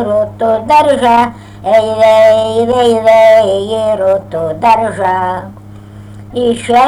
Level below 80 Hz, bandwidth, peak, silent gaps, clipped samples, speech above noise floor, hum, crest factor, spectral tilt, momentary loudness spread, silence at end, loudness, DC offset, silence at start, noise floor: -42 dBFS; 12.5 kHz; 0 dBFS; none; under 0.1%; 22 dB; none; 10 dB; -5 dB/octave; 11 LU; 0 s; -10 LUFS; under 0.1%; 0 s; -31 dBFS